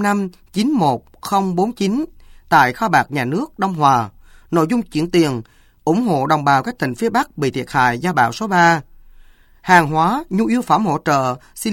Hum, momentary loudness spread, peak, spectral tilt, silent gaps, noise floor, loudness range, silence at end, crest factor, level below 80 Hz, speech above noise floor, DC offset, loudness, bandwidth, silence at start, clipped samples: none; 9 LU; 0 dBFS; -5.5 dB/octave; none; -45 dBFS; 2 LU; 0 s; 18 dB; -48 dBFS; 29 dB; under 0.1%; -17 LUFS; 17 kHz; 0 s; under 0.1%